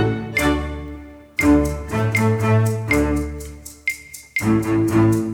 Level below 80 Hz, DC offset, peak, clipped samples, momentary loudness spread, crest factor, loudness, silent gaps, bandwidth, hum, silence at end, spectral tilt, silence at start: -32 dBFS; under 0.1%; -4 dBFS; under 0.1%; 15 LU; 14 dB; -19 LUFS; none; 18 kHz; none; 0 s; -6.5 dB/octave; 0 s